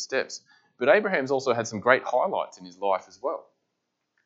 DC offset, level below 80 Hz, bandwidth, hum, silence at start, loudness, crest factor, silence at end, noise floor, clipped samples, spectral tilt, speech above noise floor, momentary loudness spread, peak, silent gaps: under 0.1%; -82 dBFS; 8 kHz; none; 0 s; -25 LUFS; 24 dB; 0.85 s; -80 dBFS; under 0.1%; -4 dB/octave; 54 dB; 14 LU; -4 dBFS; none